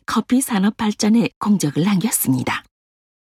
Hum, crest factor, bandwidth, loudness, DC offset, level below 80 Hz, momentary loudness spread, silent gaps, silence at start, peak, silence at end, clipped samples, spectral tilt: none; 14 dB; 16.5 kHz; -18 LUFS; under 0.1%; -56 dBFS; 4 LU; 1.36-1.41 s; 0.1 s; -4 dBFS; 0.75 s; under 0.1%; -4.5 dB/octave